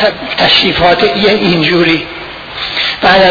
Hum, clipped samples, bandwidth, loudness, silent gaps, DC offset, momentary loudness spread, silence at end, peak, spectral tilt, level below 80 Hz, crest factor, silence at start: none; 0.4%; 5.4 kHz; -9 LUFS; none; under 0.1%; 13 LU; 0 s; 0 dBFS; -5.5 dB/octave; -36 dBFS; 10 dB; 0 s